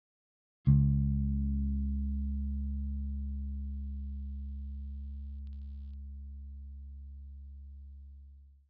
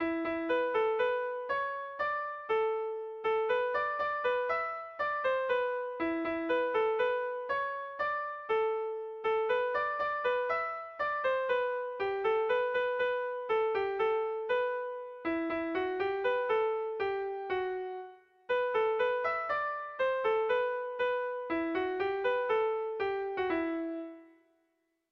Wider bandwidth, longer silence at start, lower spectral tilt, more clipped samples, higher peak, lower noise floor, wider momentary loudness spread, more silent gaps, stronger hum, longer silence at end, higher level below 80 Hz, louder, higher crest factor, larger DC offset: second, 1.3 kHz vs 6 kHz; first, 0.65 s vs 0 s; first, -13.5 dB/octave vs -5.5 dB/octave; neither; first, -14 dBFS vs -20 dBFS; second, -55 dBFS vs -78 dBFS; first, 21 LU vs 6 LU; neither; neither; second, 0.15 s vs 0.85 s; first, -38 dBFS vs -70 dBFS; second, -35 LUFS vs -32 LUFS; first, 20 dB vs 12 dB; neither